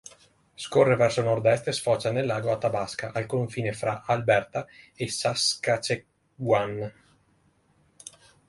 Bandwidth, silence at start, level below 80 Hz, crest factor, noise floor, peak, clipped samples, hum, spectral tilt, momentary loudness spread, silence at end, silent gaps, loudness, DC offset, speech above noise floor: 11.5 kHz; 0.6 s; -62 dBFS; 20 dB; -65 dBFS; -6 dBFS; under 0.1%; none; -4.5 dB/octave; 14 LU; 0.4 s; none; -26 LUFS; under 0.1%; 40 dB